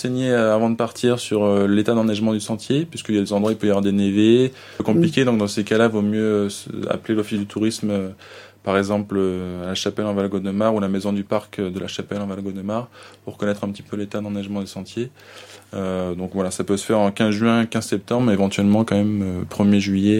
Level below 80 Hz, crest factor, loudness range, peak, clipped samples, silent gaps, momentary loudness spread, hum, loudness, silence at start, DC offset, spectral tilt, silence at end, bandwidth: -58 dBFS; 18 dB; 9 LU; -2 dBFS; under 0.1%; none; 11 LU; none; -21 LUFS; 0 s; under 0.1%; -6 dB/octave; 0 s; 15 kHz